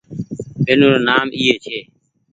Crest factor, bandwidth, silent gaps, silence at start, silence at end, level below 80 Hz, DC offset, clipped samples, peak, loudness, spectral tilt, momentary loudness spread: 18 dB; 8.8 kHz; none; 0.1 s; 0.5 s; -52 dBFS; under 0.1%; under 0.1%; 0 dBFS; -15 LUFS; -5.5 dB/octave; 17 LU